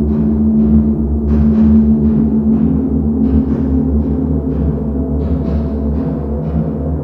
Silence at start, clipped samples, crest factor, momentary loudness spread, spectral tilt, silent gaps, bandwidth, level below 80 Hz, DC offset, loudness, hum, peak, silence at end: 0 s; under 0.1%; 12 dB; 7 LU; -12.5 dB/octave; none; 2.7 kHz; -20 dBFS; under 0.1%; -14 LUFS; none; 0 dBFS; 0 s